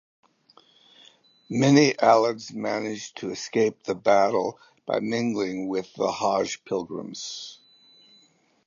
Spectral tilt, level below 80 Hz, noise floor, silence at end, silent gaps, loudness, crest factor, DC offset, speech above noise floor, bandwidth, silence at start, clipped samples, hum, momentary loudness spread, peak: -5 dB/octave; -70 dBFS; -62 dBFS; 1.15 s; none; -24 LUFS; 22 dB; under 0.1%; 38 dB; 7.4 kHz; 1.5 s; under 0.1%; none; 15 LU; -4 dBFS